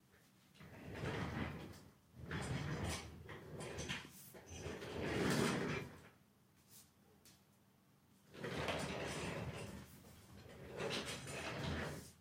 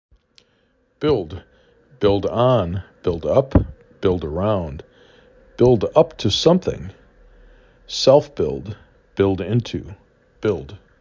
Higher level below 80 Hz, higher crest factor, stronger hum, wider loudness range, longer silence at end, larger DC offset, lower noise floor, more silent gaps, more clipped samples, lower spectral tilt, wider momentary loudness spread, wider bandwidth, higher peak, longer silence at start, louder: second, -64 dBFS vs -38 dBFS; about the same, 22 dB vs 20 dB; neither; about the same, 5 LU vs 3 LU; second, 0 s vs 0.25 s; neither; first, -71 dBFS vs -62 dBFS; neither; neither; second, -4.5 dB/octave vs -6.5 dB/octave; first, 21 LU vs 18 LU; first, 16 kHz vs 7.6 kHz; second, -24 dBFS vs -2 dBFS; second, 0.15 s vs 1 s; second, -45 LUFS vs -19 LUFS